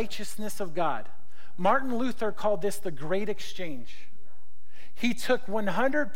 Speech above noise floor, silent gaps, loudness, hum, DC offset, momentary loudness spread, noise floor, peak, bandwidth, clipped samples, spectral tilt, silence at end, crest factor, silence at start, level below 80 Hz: 34 dB; none; -30 LUFS; none; 6%; 12 LU; -64 dBFS; -10 dBFS; 16.5 kHz; under 0.1%; -5 dB/octave; 0 s; 18 dB; 0 s; -62 dBFS